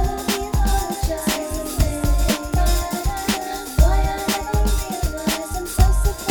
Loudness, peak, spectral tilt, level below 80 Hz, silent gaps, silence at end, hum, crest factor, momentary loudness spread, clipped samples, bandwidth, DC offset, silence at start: -21 LUFS; -2 dBFS; -4.5 dB/octave; -22 dBFS; none; 0 s; none; 18 dB; 6 LU; under 0.1%; over 20 kHz; under 0.1%; 0 s